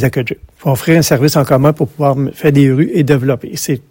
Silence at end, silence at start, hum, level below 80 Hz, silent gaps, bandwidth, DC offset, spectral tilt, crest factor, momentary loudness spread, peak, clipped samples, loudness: 0.1 s; 0 s; none; -44 dBFS; none; 17 kHz; under 0.1%; -6 dB/octave; 12 dB; 8 LU; 0 dBFS; 0.6%; -12 LUFS